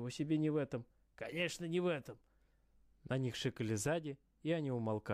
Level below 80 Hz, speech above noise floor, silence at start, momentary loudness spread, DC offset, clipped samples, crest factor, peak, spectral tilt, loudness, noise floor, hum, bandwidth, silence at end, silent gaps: -70 dBFS; 33 dB; 0 s; 10 LU; under 0.1%; under 0.1%; 14 dB; -26 dBFS; -5.5 dB/octave; -39 LUFS; -72 dBFS; none; 15 kHz; 0 s; none